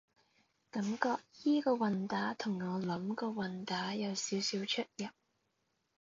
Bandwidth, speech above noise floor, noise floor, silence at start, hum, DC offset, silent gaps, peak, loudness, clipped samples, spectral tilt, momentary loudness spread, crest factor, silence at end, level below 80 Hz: 7.6 kHz; 45 dB; -81 dBFS; 0.75 s; none; under 0.1%; none; -14 dBFS; -36 LUFS; under 0.1%; -4 dB/octave; 7 LU; 22 dB; 0.9 s; -80 dBFS